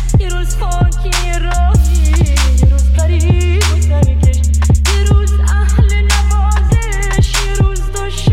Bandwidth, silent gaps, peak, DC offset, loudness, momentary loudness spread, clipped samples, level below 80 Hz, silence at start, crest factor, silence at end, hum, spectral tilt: 14 kHz; none; 0 dBFS; under 0.1%; -13 LUFS; 5 LU; under 0.1%; -12 dBFS; 0 s; 10 dB; 0 s; none; -5 dB/octave